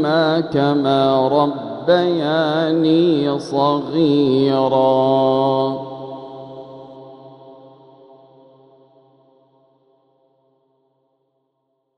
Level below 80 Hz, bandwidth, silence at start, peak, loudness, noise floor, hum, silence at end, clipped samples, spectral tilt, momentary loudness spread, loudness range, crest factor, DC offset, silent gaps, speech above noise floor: -62 dBFS; 10 kHz; 0 s; -4 dBFS; -17 LUFS; -71 dBFS; none; 4.45 s; under 0.1%; -7.5 dB/octave; 20 LU; 12 LU; 16 dB; under 0.1%; none; 55 dB